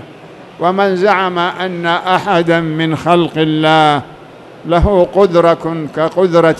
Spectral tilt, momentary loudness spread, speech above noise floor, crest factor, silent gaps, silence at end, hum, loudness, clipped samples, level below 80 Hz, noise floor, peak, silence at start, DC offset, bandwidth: -6.5 dB/octave; 7 LU; 23 dB; 12 dB; none; 0 s; none; -12 LUFS; 0.2%; -30 dBFS; -35 dBFS; 0 dBFS; 0 s; under 0.1%; 12 kHz